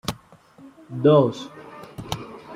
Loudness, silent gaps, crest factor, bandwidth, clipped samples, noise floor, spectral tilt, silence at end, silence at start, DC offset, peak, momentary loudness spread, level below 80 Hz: -21 LUFS; none; 20 dB; 16 kHz; under 0.1%; -50 dBFS; -7 dB/octave; 0 s; 0.1 s; under 0.1%; -4 dBFS; 23 LU; -54 dBFS